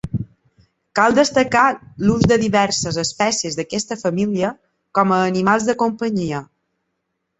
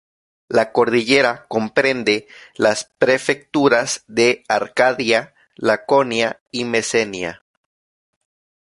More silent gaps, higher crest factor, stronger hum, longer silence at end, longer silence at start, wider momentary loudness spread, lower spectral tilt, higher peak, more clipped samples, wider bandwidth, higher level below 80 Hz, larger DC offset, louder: second, none vs 6.41-6.46 s; about the same, 18 dB vs 18 dB; neither; second, 0.95 s vs 1.4 s; second, 0.05 s vs 0.5 s; first, 10 LU vs 7 LU; about the same, -4.5 dB/octave vs -3.5 dB/octave; about the same, -2 dBFS vs -2 dBFS; neither; second, 8.4 kHz vs 11.5 kHz; first, -48 dBFS vs -60 dBFS; neither; about the same, -18 LUFS vs -18 LUFS